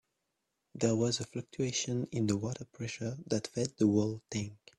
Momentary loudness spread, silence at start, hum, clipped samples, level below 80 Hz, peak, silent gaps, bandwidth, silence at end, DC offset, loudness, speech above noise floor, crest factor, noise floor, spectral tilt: 11 LU; 0.75 s; none; under 0.1%; -68 dBFS; -16 dBFS; none; 12 kHz; 0.25 s; under 0.1%; -34 LUFS; 50 dB; 18 dB; -84 dBFS; -5 dB/octave